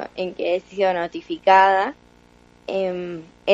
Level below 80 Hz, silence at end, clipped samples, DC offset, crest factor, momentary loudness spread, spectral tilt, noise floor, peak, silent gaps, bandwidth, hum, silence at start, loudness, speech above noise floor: -60 dBFS; 0 s; under 0.1%; under 0.1%; 18 dB; 15 LU; -5.5 dB/octave; -52 dBFS; -2 dBFS; none; 7.8 kHz; 60 Hz at -55 dBFS; 0 s; -21 LUFS; 32 dB